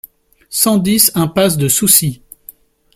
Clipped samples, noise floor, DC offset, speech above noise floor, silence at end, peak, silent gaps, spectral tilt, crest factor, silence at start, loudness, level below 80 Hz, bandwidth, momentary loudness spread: under 0.1%; -42 dBFS; under 0.1%; 29 dB; 0.8 s; 0 dBFS; none; -3.5 dB/octave; 14 dB; 0.5 s; -12 LUFS; -48 dBFS; over 20 kHz; 13 LU